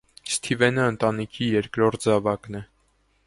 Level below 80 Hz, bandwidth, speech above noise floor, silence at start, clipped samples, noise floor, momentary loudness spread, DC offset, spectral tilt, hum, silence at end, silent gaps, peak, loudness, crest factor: -56 dBFS; 11.5 kHz; 42 dB; 0.25 s; under 0.1%; -65 dBFS; 9 LU; under 0.1%; -5 dB/octave; none; 0.65 s; none; -4 dBFS; -23 LUFS; 22 dB